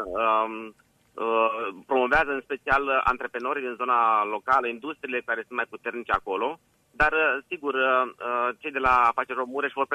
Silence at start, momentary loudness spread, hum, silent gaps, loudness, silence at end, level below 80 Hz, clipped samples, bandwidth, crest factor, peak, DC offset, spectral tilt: 0 s; 10 LU; none; none; -25 LUFS; 0 s; -50 dBFS; under 0.1%; 13 kHz; 18 dB; -8 dBFS; under 0.1%; -5 dB/octave